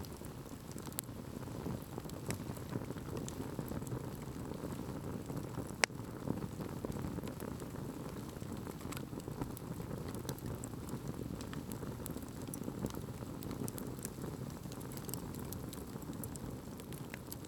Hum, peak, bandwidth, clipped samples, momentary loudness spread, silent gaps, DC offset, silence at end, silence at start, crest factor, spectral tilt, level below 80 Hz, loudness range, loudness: none; -6 dBFS; over 20 kHz; under 0.1%; 4 LU; none; under 0.1%; 0 s; 0 s; 36 dB; -5 dB/octave; -58 dBFS; 3 LU; -44 LUFS